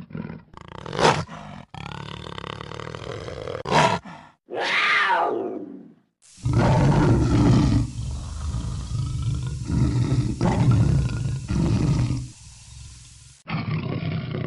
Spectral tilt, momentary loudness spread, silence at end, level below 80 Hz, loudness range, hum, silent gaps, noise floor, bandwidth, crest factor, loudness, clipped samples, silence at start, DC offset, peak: -6 dB/octave; 21 LU; 0 s; -34 dBFS; 6 LU; none; none; -53 dBFS; 11.5 kHz; 20 dB; -23 LUFS; under 0.1%; 0 s; under 0.1%; -4 dBFS